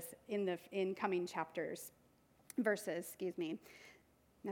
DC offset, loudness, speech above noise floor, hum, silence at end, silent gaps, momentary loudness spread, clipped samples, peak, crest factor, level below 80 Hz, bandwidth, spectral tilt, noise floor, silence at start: under 0.1%; -42 LUFS; 30 dB; none; 0 s; none; 14 LU; under 0.1%; -22 dBFS; 22 dB; -82 dBFS; 19 kHz; -5 dB/octave; -71 dBFS; 0 s